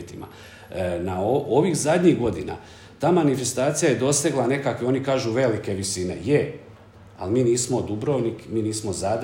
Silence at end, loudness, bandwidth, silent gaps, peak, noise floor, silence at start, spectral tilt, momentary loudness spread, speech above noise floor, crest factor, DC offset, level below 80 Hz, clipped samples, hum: 0 s; -23 LUFS; 16.5 kHz; none; -6 dBFS; -46 dBFS; 0 s; -5 dB/octave; 14 LU; 24 dB; 16 dB; under 0.1%; -56 dBFS; under 0.1%; none